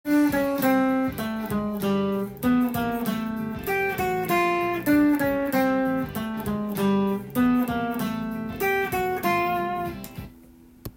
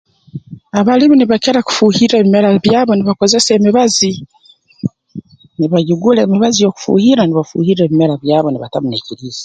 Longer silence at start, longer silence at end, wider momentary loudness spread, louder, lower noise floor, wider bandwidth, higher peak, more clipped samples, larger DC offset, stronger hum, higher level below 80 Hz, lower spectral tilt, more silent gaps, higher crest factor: second, 0.05 s vs 0.35 s; about the same, 0.05 s vs 0 s; second, 8 LU vs 14 LU; second, -25 LUFS vs -11 LUFS; first, -50 dBFS vs -32 dBFS; first, 17 kHz vs 9.2 kHz; second, -10 dBFS vs 0 dBFS; neither; neither; neither; about the same, -50 dBFS vs -52 dBFS; about the same, -6 dB/octave vs -5 dB/octave; neither; about the same, 14 dB vs 12 dB